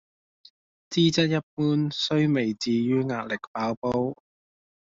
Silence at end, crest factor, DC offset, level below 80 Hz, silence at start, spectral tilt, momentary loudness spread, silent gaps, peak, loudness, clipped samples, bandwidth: 0.8 s; 16 dB; under 0.1%; -62 dBFS; 0.9 s; -5 dB/octave; 8 LU; 1.43-1.57 s, 3.47-3.55 s, 3.77-3.82 s; -10 dBFS; -25 LUFS; under 0.1%; 7.6 kHz